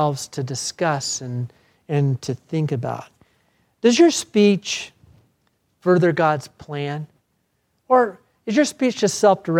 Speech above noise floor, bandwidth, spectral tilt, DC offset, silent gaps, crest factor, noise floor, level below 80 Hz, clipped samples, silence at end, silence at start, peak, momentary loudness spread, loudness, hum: 50 dB; 15.5 kHz; -5 dB/octave; under 0.1%; none; 18 dB; -69 dBFS; -66 dBFS; under 0.1%; 0 s; 0 s; -2 dBFS; 14 LU; -20 LUFS; none